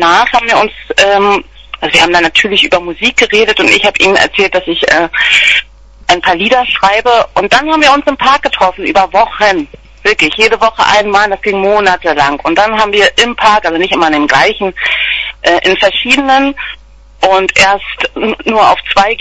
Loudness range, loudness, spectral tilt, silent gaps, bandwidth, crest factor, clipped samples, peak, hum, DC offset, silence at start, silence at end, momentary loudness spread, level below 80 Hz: 2 LU; -8 LUFS; -2.5 dB/octave; none; 11 kHz; 10 dB; 0.7%; 0 dBFS; none; under 0.1%; 0 s; 0.05 s; 5 LU; -36 dBFS